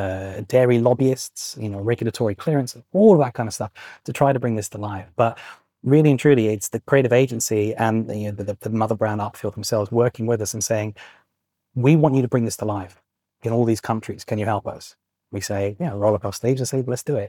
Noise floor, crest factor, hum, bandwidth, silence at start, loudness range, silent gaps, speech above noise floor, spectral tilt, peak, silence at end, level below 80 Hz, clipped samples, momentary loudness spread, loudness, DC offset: -77 dBFS; 18 dB; none; 19 kHz; 0 s; 5 LU; none; 57 dB; -6 dB/octave; -4 dBFS; 0 s; -62 dBFS; under 0.1%; 14 LU; -21 LUFS; under 0.1%